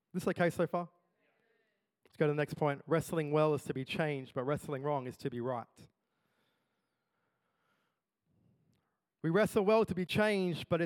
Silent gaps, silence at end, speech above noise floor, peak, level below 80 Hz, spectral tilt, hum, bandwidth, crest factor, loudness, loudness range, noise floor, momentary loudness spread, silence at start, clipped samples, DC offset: none; 0 s; 50 dB; -16 dBFS; -70 dBFS; -6.5 dB/octave; none; 18 kHz; 20 dB; -34 LUFS; 10 LU; -84 dBFS; 9 LU; 0.15 s; under 0.1%; under 0.1%